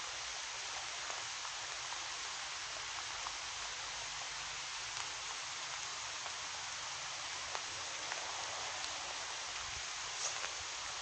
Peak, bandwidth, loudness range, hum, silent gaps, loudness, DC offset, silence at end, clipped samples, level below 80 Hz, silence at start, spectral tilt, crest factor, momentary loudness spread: -18 dBFS; 13.5 kHz; 1 LU; none; none; -41 LUFS; under 0.1%; 0 s; under 0.1%; -70 dBFS; 0 s; 1 dB/octave; 26 dB; 1 LU